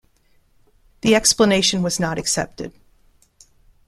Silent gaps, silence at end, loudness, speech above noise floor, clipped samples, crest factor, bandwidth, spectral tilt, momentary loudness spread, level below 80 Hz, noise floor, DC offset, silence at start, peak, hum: none; 1.2 s; -18 LUFS; 40 dB; under 0.1%; 22 dB; 15 kHz; -3 dB/octave; 16 LU; -48 dBFS; -58 dBFS; under 0.1%; 1.05 s; 0 dBFS; none